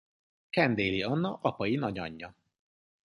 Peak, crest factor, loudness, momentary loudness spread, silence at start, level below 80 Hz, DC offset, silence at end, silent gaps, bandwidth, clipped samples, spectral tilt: -10 dBFS; 22 dB; -30 LUFS; 14 LU; 0.55 s; -60 dBFS; under 0.1%; 0.75 s; none; 11.5 kHz; under 0.1%; -7.5 dB/octave